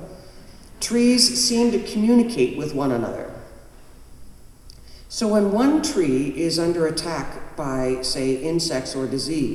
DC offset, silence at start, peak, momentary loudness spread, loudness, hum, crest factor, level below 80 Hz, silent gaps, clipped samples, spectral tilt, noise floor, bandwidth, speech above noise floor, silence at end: under 0.1%; 0 s; -2 dBFS; 13 LU; -21 LUFS; none; 20 dB; -44 dBFS; none; under 0.1%; -4 dB/octave; -43 dBFS; 14.5 kHz; 23 dB; 0 s